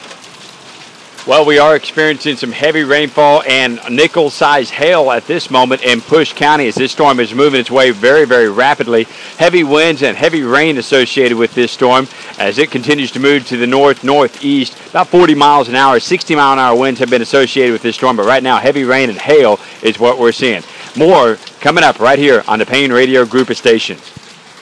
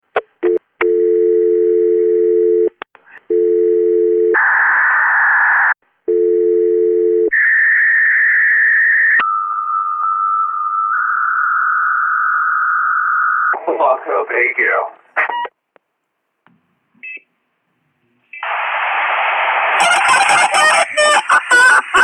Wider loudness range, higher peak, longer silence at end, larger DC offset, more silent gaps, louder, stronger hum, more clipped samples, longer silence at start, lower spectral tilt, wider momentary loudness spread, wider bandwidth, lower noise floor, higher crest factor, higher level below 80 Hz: second, 2 LU vs 9 LU; about the same, 0 dBFS vs 0 dBFS; first, 0.5 s vs 0 s; neither; neither; first, -10 LUFS vs -13 LUFS; neither; first, 0.5% vs under 0.1%; second, 0 s vs 0.15 s; first, -4 dB/octave vs -1 dB/octave; second, 6 LU vs 9 LU; about the same, 11 kHz vs 12 kHz; second, -35 dBFS vs -71 dBFS; about the same, 10 dB vs 14 dB; first, -54 dBFS vs -64 dBFS